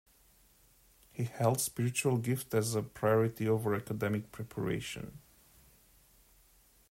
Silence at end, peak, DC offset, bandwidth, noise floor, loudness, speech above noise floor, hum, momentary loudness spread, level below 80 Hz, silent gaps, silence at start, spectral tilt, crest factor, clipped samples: 1.75 s; -16 dBFS; under 0.1%; 16 kHz; -65 dBFS; -33 LUFS; 32 dB; none; 12 LU; -64 dBFS; none; 1.15 s; -5.5 dB/octave; 20 dB; under 0.1%